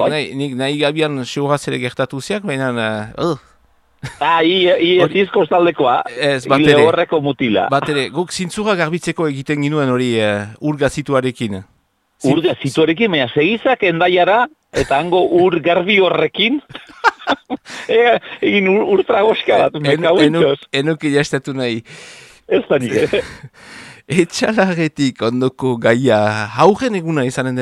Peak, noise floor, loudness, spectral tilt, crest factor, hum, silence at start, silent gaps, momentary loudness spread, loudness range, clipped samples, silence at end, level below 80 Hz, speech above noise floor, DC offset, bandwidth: 0 dBFS; -55 dBFS; -15 LUFS; -5.5 dB/octave; 16 dB; none; 0 s; none; 9 LU; 5 LU; under 0.1%; 0 s; -50 dBFS; 39 dB; under 0.1%; 12.5 kHz